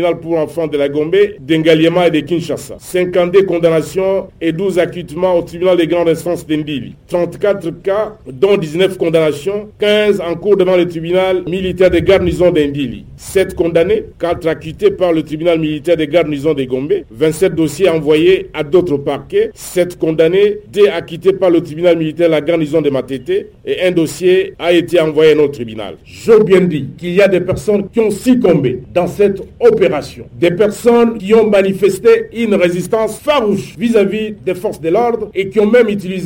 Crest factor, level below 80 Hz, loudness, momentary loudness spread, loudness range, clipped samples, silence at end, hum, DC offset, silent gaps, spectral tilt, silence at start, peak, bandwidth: 12 dB; -40 dBFS; -13 LUFS; 8 LU; 3 LU; under 0.1%; 0 s; none; under 0.1%; none; -6 dB/octave; 0 s; 0 dBFS; 17 kHz